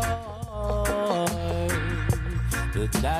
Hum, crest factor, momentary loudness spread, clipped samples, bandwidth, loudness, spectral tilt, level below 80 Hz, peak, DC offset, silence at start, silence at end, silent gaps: none; 16 dB; 5 LU; under 0.1%; 16 kHz; -27 LUFS; -5 dB/octave; -32 dBFS; -10 dBFS; under 0.1%; 0 s; 0 s; none